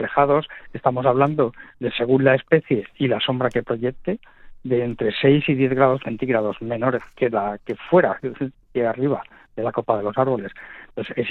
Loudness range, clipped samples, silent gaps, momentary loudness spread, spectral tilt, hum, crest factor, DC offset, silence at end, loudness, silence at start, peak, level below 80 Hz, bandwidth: 3 LU; under 0.1%; none; 12 LU; -9 dB/octave; none; 18 dB; under 0.1%; 0 s; -21 LUFS; 0 s; -2 dBFS; -52 dBFS; 4.4 kHz